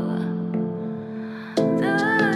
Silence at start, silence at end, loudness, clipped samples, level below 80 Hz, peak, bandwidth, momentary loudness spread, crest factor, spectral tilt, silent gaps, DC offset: 0 s; 0 s; -24 LUFS; under 0.1%; -72 dBFS; -8 dBFS; 12 kHz; 12 LU; 16 dB; -7 dB/octave; none; under 0.1%